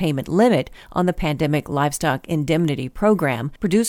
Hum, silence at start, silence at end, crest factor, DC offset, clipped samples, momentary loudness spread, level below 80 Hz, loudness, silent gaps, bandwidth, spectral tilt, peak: none; 0 s; 0 s; 16 dB; under 0.1%; under 0.1%; 6 LU; -40 dBFS; -20 LUFS; none; 18 kHz; -6 dB/octave; -4 dBFS